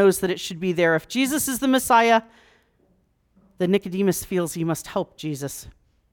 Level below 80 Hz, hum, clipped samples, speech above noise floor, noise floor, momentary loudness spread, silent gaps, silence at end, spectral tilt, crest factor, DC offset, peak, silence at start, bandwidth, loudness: -56 dBFS; none; under 0.1%; 43 dB; -64 dBFS; 13 LU; none; 0.4 s; -4.5 dB/octave; 16 dB; under 0.1%; -6 dBFS; 0 s; 19.5 kHz; -22 LUFS